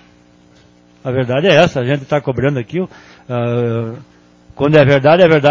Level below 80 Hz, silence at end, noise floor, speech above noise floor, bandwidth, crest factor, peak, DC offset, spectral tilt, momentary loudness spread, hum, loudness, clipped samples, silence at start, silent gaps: -46 dBFS; 0 s; -47 dBFS; 34 dB; 7.6 kHz; 14 dB; 0 dBFS; under 0.1%; -7 dB/octave; 15 LU; 60 Hz at -35 dBFS; -13 LUFS; under 0.1%; 1.05 s; none